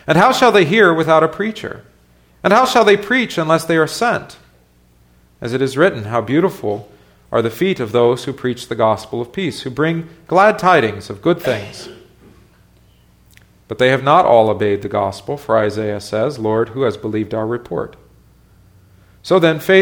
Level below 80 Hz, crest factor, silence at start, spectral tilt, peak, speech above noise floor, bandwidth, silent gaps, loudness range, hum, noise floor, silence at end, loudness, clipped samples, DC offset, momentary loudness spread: -52 dBFS; 16 dB; 0.05 s; -5.5 dB/octave; 0 dBFS; 37 dB; 20 kHz; none; 5 LU; none; -52 dBFS; 0 s; -15 LUFS; under 0.1%; under 0.1%; 13 LU